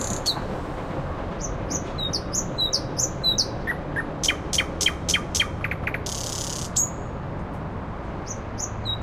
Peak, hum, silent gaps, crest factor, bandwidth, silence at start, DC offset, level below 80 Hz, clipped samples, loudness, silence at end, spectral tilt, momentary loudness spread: -8 dBFS; none; none; 20 dB; 16.5 kHz; 0 s; under 0.1%; -38 dBFS; under 0.1%; -26 LUFS; 0 s; -2.5 dB/octave; 11 LU